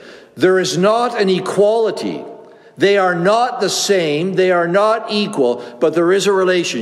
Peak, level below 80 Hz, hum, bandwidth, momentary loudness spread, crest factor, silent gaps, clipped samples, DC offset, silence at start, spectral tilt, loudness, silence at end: -2 dBFS; -70 dBFS; none; 13 kHz; 5 LU; 14 dB; none; under 0.1%; under 0.1%; 0.05 s; -4.5 dB/octave; -15 LUFS; 0 s